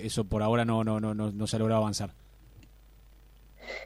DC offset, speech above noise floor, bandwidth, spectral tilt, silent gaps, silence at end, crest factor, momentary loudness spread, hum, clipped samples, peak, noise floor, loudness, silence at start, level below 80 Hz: under 0.1%; 26 dB; 16 kHz; -6 dB/octave; none; 0 s; 16 dB; 13 LU; none; under 0.1%; -16 dBFS; -55 dBFS; -29 LUFS; 0 s; -50 dBFS